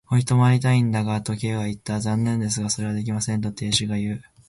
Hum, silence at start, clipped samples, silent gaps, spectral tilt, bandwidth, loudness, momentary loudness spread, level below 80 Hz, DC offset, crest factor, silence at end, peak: none; 0.1 s; under 0.1%; none; -5 dB/octave; 11.5 kHz; -23 LUFS; 9 LU; -52 dBFS; under 0.1%; 16 dB; 0.25 s; -6 dBFS